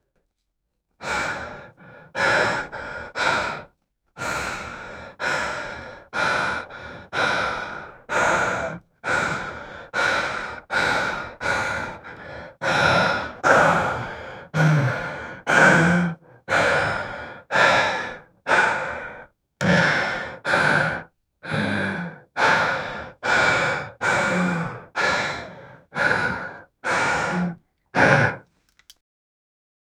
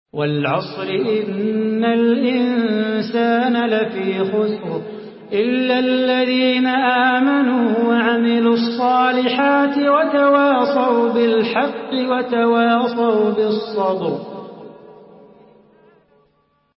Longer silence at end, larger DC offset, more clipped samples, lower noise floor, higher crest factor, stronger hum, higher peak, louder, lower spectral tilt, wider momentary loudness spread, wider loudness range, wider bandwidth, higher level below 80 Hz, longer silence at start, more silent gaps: second, 1.6 s vs 1.85 s; neither; neither; first, -76 dBFS vs -62 dBFS; first, 24 dB vs 14 dB; neither; first, 0 dBFS vs -4 dBFS; second, -22 LUFS vs -17 LUFS; second, -4.5 dB/octave vs -10.5 dB/octave; first, 17 LU vs 7 LU; about the same, 6 LU vs 4 LU; first, 14.5 kHz vs 5.8 kHz; first, -52 dBFS vs -68 dBFS; first, 1 s vs 0.15 s; neither